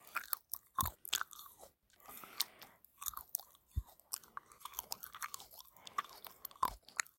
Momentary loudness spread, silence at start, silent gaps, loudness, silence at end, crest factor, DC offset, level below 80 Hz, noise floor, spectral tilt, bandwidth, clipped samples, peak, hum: 15 LU; 0 s; none; -43 LUFS; 0.15 s; 34 dB; under 0.1%; -60 dBFS; -63 dBFS; -1 dB/octave; 17 kHz; under 0.1%; -12 dBFS; none